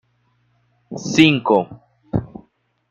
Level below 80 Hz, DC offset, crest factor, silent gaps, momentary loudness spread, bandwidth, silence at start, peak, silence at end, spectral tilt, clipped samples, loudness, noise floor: -48 dBFS; under 0.1%; 18 dB; none; 20 LU; 8.2 kHz; 0.9 s; -2 dBFS; 0.65 s; -5 dB/octave; under 0.1%; -17 LUFS; -63 dBFS